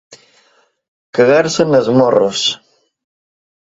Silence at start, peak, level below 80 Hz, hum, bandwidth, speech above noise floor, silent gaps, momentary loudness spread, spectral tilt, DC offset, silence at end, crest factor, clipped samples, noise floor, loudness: 0.1 s; 0 dBFS; -56 dBFS; none; 7.8 kHz; 44 dB; 0.88-1.13 s; 8 LU; -4.5 dB/octave; under 0.1%; 1.05 s; 16 dB; under 0.1%; -55 dBFS; -13 LUFS